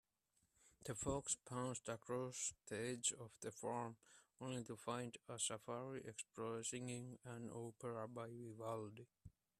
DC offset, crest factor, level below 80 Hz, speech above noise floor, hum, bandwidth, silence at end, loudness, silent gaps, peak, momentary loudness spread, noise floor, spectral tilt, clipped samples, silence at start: under 0.1%; 22 dB; -74 dBFS; 36 dB; none; 14 kHz; 0.3 s; -48 LUFS; none; -28 dBFS; 10 LU; -85 dBFS; -3.5 dB/octave; under 0.1%; 0.65 s